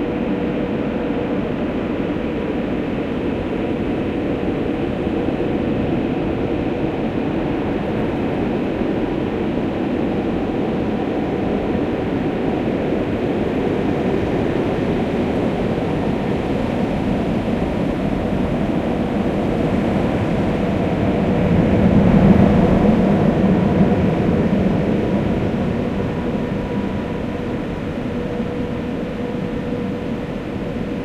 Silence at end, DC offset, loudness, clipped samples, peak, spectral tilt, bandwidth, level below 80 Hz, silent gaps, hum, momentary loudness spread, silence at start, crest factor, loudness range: 0 s; under 0.1%; -20 LUFS; under 0.1%; 0 dBFS; -8.5 dB/octave; 9.6 kHz; -34 dBFS; none; none; 8 LU; 0 s; 18 dB; 7 LU